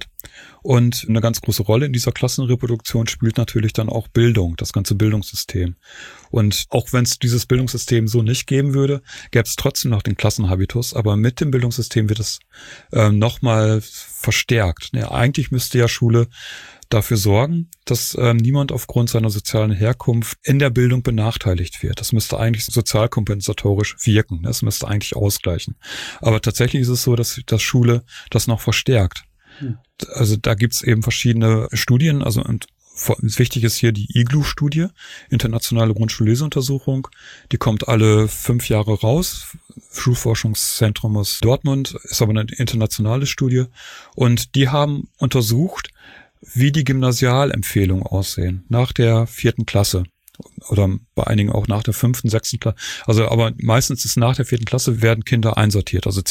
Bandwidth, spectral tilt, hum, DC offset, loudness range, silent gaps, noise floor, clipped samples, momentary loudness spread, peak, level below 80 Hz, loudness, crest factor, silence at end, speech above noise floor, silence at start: 17 kHz; -5.5 dB/octave; none; under 0.1%; 2 LU; none; -46 dBFS; under 0.1%; 8 LU; 0 dBFS; -38 dBFS; -18 LUFS; 16 dB; 0 s; 28 dB; 0 s